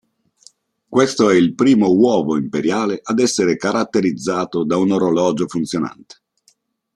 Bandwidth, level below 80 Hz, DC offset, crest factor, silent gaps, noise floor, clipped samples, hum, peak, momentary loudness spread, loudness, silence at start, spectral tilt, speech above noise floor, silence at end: 12 kHz; -58 dBFS; under 0.1%; 16 dB; none; -60 dBFS; under 0.1%; none; -2 dBFS; 8 LU; -17 LUFS; 0.9 s; -5.5 dB/octave; 43 dB; 1 s